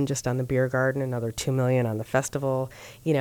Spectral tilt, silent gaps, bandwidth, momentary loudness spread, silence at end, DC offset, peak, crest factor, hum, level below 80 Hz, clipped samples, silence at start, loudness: -6 dB/octave; none; 18.5 kHz; 6 LU; 0 s; under 0.1%; -10 dBFS; 16 dB; none; -54 dBFS; under 0.1%; 0 s; -26 LUFS